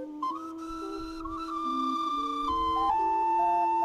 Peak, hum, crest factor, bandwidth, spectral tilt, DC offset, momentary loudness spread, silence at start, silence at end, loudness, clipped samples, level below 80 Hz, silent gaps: -16 dBFS; none; 12 dB; 12.5 kHz; -5 dB/octave; under 0.1%; 12 LU; 0 s; 0 s; -30 LUFS; under 0.1%; -52 dBFS; none